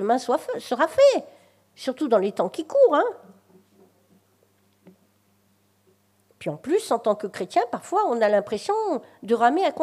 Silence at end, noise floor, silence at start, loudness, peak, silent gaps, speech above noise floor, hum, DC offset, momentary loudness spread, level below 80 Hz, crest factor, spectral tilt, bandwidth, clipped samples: 0 s; -64 dBFS; 0 s; -23 LUFS; -6 dBFS; none; 42 dB; none; under 0.1%; 12 LU; -74 dBFS; 20 dB; -4.5 dB/octave; 14 kHz; under 0.1%